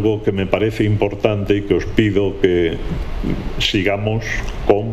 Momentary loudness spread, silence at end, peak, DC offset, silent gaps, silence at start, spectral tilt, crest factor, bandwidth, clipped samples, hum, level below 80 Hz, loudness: 8 LU; 0 s; 0 dBFS; under 0.1%; none; 0 s; -6.5 dB/octave; 18 dB; 13.5 kHz; under 0.1%; none; -28 dBFS; -18 LUFS